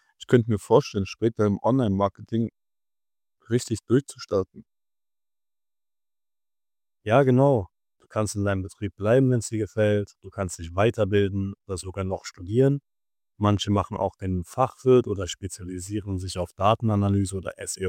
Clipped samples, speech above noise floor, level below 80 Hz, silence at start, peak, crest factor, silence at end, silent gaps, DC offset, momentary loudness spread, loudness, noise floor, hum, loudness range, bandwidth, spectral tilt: under 0.1%; over 66 dB; -54 dBFS; 0.2 s; -4 dBFS; 22 dB; 0 s; none; under 0.1%; 12 LU; -25 LUFS; under -90 dBFS; none; 6 LU; 15.5 kHz; -6.5 dB/octave